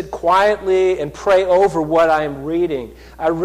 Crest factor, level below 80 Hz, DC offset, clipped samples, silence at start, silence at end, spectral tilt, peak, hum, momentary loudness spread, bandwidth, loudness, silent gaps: 12 dB; -42 dBFS; under 0.1%; under 0.1%; 0 s; 0 s; -6 dB/octave; -6 dBFS; none; 8 LU; 13.5 kHz; -16 LUFS; none